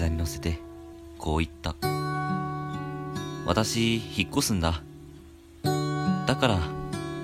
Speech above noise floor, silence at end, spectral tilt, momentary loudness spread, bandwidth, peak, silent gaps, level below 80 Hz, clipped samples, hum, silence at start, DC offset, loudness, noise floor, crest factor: 22 dB; 0 s; -5 dB/octave; 12 LU; 16 kHz; -6 dBFS; none; -40 dBFS; under 0.1%; none; 0 s; under 0.1%; -28 LUFS; -49 dBFS; 22 dB